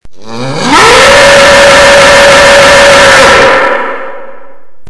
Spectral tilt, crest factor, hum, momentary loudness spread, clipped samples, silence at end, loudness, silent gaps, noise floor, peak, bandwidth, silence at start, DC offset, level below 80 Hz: -2 dB/octave; 4 dB; none; 15 LU; 20%; 0 s; -1 LUFS; none; -36 dBFS; 0 dBFS; 12 kHz; 0.05 s; under 0.1%; -28 dBFS